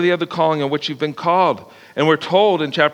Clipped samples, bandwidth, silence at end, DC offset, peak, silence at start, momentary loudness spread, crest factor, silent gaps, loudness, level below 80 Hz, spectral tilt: under 0.1%; 12 kHz; 0 s; under 0.1%; 0 dBFS; 0 s; 7 LU; 16 dB; none; -17 LUFS; -68 dBFS; -6 dB/octave